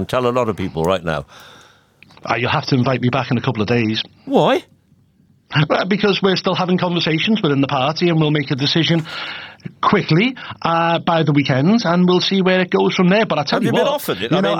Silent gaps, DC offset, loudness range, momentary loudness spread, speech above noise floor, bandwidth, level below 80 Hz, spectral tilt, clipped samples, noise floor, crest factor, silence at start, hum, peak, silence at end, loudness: none; under 0.1%; 4 LU; 7 LU; 38 dB; 18.5 kHz; -52 dBFS; -6.5 dB/octave; under 0.1%; -55 dBFS; 16 dB; 0 s; none; -2 dBFS; 0 s; -17 LUFS